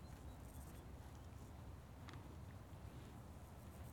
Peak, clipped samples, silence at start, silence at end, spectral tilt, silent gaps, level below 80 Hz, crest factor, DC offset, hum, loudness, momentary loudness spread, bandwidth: -40 dBFS; under 0.1%; 0 s; 0 s; -6 dB/octave; none; -62 dBFS; 16 dB; under 0.1%; none; -57 LUFS; 2 LU; 19 kHz